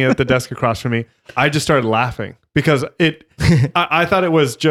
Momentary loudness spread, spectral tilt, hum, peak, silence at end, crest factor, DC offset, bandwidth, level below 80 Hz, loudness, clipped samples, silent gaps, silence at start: 7 LU; -5.5 dB/octave; none; -2 dBFS; 0 s; 14 dB; under 0.1%; 15 kHz; -38 dBFS; -16 LUFS; under 0.1%; none; 0 s